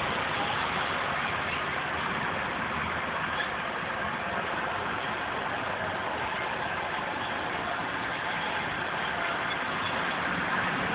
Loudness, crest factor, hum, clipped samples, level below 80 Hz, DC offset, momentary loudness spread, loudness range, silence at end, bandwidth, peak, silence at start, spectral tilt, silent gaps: -30 LUFS; 16 dB; none; under 0.1%; -54 dBFS; under 0.1%; 3 LU; 2 LU; 0 s; 4 kHz; -16 dBFS; 0 s; -1.5 dB/octave; none